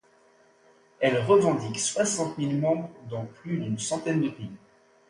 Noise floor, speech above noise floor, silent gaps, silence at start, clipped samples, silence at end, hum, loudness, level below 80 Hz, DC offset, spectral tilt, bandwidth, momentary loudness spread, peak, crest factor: -60 dBFS; 34 dB; none; 1 s; under 0.1%; 0.5 s; none; -27 LUFS; -66 dBFS; under 0.1%; -5 dB/octave; 11.5 kHz; 15 LU; -8 dBFS; 20 dB